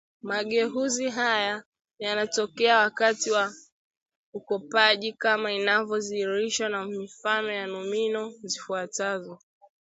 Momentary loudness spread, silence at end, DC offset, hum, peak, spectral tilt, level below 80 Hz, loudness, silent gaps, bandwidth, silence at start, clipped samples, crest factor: 12 LU; 0.45 s; under 0.1%; none; -4 dBFS; -2 dB/octave; -76 dBFS; -26 LUFS; 1.66-1.72 s, 3.72-4.06 s, 4.16-4.33 s; 8.2 kHz; 0.25 s; under 0.1%; 22 dB